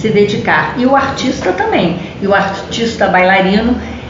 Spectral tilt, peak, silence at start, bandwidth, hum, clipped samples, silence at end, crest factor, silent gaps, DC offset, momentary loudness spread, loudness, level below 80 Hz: -5.5 dB/octave; 0 dBFS; 0 s; 7.6 kHz; none; under 0.1%; 0 s; 12 dB; none; under 0.1%; 8 LU; -12 LUFS; -36 dBFS